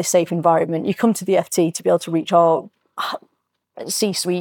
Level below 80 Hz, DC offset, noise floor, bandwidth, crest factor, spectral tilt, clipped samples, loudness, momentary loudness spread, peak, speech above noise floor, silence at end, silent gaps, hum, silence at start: -74 dBFS; under 0.1%; -71 dBFS; 19.5 kHz; 16 dB; -4.5 dB/octave; under 0.1%; -19 LUFS; 11 LU; -4 dBFS; 53 dB; 0 s; none; none; 0 s